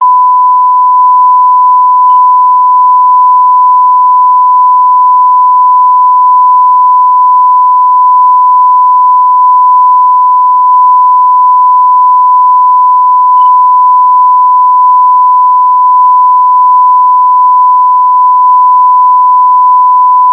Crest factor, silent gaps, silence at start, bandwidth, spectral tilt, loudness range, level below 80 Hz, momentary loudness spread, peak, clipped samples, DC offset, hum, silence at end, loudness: 4 dB; none; 0 s; 2 kHz; -6 dB/octave; 0 LU; -66 dBFS; 1 LU; 0 dBFS; 0.3%; under 0.1%; 50 Hz at -60 dBFS; 0 s; -4 LUFS